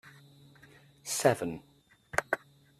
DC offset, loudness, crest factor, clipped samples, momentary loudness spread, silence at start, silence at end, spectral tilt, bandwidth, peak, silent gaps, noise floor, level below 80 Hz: under 0.1%; -32 LUFS; 26 dB; under 0.1%; 15 LU; 0.05 s; 0.45 s; -3.5 dB/octave; 14.5 kHz; -8 dBFS; none; -58 dBFS; -68 dBFS